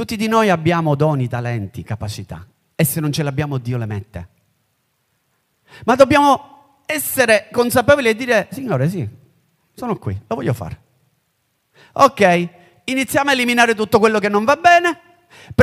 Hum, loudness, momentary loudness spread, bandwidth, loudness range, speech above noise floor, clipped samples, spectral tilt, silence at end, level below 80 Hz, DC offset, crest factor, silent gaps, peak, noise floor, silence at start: none; -16 LUFS; 17 LU; 16 kHz; 9 LU; 51 dB; under 0.1%; -5 dB/octave; 0 s; -50 dBFS; under 0.1%; 18 dB; none; 0 dBFS; -67 dBFS; 0 s